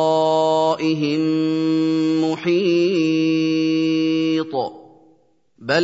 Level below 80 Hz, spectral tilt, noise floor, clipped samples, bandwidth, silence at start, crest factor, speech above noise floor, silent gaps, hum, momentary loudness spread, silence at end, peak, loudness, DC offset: -70 dBFS; -6 dB/octave; -59 dBFS; under 0.1%; 7.8 kHz; 0 s; 16 dB; 40 dB; none; none; 4 LU; 0 s; -4 dBFS; -19 LUFS; under 0.1%